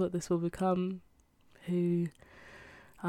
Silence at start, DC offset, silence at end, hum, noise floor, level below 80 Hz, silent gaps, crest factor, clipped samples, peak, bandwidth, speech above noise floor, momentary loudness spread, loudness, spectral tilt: 0 s; under 0.1%; 0 s; none; -64 dBFS; -64 dBFS; none; 14 dB; under 0.1%; -20 dBFS; 12 kHz; 32 dB; 21 LU; -33 LUFS; -7.5 dB/octave